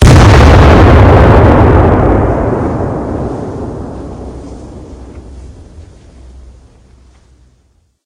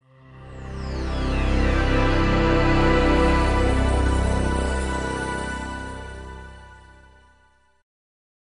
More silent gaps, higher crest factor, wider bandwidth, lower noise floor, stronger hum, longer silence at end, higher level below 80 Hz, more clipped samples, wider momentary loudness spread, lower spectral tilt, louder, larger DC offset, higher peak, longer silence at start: neither; second, 8 dB vs 16 dB; about the same, 11 kHz vs 11 kHz; second, -53 dBFS vs -60 dBFS; neither; first, 2.25 s vs 1.8 s; first, -16 dBFS vs -26 dBFS; first, 8% vs under 0.1%; first, 23 LU vs 18 LU; about the same, -7 dB/octave vs -6 dB/octave; first, -7 LUFS vs -22 LUFS; neither; first, 0 dBFS vs -6 dBFS; second, 0 s vs 0.3 s